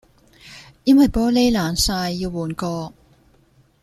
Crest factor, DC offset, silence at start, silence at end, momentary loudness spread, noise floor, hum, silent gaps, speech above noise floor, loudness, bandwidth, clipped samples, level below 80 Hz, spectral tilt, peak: 16 dB; under 0.1%; 0.45 s; 0.95 s; 18 LU; -56 dBFS; none; none; 38 dB; -19 LUFS; 14.5 kHz; under 0.1%; -38 dBFS; -4.5 dB/octave; -4 dBFS